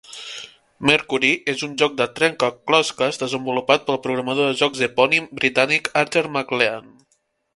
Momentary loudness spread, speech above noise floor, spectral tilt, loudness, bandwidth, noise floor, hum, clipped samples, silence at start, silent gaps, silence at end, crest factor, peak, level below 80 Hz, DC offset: 6 LU; 47 dB; -3.5 dB/octave; -19 LUFS; 11.5 kHz; -67 dBFS; none; under 0.1%; 0.1 s; none; 0.75 s; 20 dB; 0 dBFS; -62 dBFS; under 0.1%